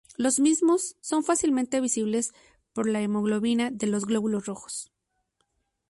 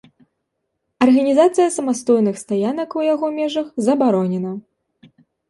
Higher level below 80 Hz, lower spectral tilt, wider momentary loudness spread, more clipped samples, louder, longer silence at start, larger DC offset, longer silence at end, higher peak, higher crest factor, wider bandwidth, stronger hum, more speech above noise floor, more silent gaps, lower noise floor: about the same, -66 dBFS vs -66 dBFS; second, -4 dB/octave vs -6 dB/octave; first, 12 LU vs 8 LU; neither; second, -26 LUFS vs -18 LUFS; second, 0.2 s vs 1 s; neither; first, 1.05 s vs 0.9 s; second, -12 dBFS vs -2 dBFS; about the same, 14 dB vs 16 dB; about the same, 11.5 kHz vs 11.5 kHz; neither; second, 50 dB vs 58 dB; neither; about the same, -75 dBFS vs -75 dBFS